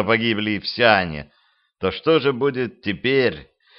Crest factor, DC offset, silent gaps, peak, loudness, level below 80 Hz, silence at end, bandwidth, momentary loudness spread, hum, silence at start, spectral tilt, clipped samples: 20 dB; under 0.1%; none; 0 dBFS; -20 LUFS; -52 dBFS; 0.35 s; 5.8 kHz; 11 LU; none; 0 s; -8.5 dB/octave; under 0.1%